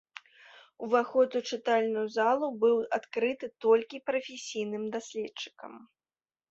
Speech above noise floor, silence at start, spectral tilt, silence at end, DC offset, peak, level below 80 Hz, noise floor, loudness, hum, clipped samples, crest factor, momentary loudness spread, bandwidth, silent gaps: over 61 dB; 0.8 s; -4 dB/octave; 0.65 s; under 0.1%; -12 dBFS; -78 dBFS; under -90 dBFS; -30 LUFS; none; under 0.1%; 18 dB; 15 LU; 8 kHz; none